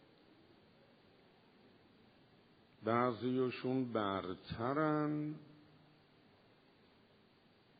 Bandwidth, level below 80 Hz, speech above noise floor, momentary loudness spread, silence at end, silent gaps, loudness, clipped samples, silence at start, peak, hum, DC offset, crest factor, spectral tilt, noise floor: 4.9 kHz; -74 dBFS; 31 dB; 10 LU; 2.25 s; none; -38 LUFS; under 0.1%; 2.8 s; -18 dBFS; none; under 0.1%; 24 dB; -5.5 dB/octave; -69 dBFS